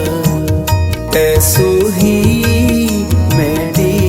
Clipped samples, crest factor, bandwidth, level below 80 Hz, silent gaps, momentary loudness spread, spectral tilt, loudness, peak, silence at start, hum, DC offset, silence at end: under 0.1%; 12 dB; 17 kHz; -26 dBFS; none; 5 LU; -5.5 dB/octave; -12 LUFS; 0 dBFS; 0 s; none; under 0.1%; 0 s